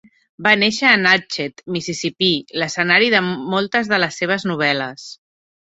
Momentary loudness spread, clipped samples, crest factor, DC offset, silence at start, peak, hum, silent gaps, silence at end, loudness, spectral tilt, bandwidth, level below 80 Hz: 12 LU; under 0.1%; 18 dB; under 0.1%; 0.4 s; 0 dBFS; none; none; 0.45 s; -17 LUFS; -3.5 dB/octave; 8.2 kHz; -62 dBFS